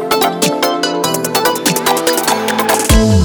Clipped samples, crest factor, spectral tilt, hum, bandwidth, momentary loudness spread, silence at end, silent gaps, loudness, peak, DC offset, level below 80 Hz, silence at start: under 0.1%; 12 dB; -3.5 dB/octave; none; 19.5 kHz; 4 LU; 0 s; none; -13 LUFS; 0 dBFS; under 0.1%; -24 dBFS; 0 s